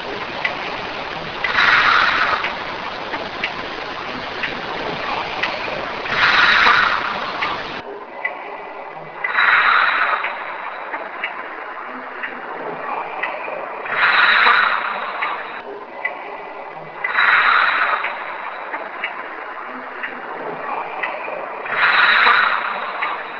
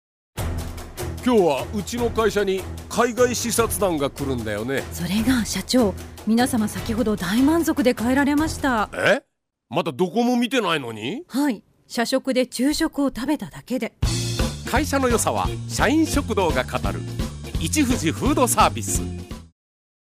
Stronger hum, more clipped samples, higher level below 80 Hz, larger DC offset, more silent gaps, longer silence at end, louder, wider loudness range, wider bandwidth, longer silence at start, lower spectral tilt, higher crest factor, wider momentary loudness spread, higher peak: neither; neither; second, -52 dBFS vs -36 dBFS; neither; neither; second, 0 s vs 0.55 s; first, -18 LUFS vs -22 LUFS; first, 8 LU vs 3 LU; second, 5.4 kHz vs 16 kHz; second, 0 s vs 0.35 s; second, -3 dB/octave vs -4.5 dB/octave; about the same, 20 dB vs 18 dB; first, 17 LU vs 10 LU; first, 0 dBFS vs -4 dBFS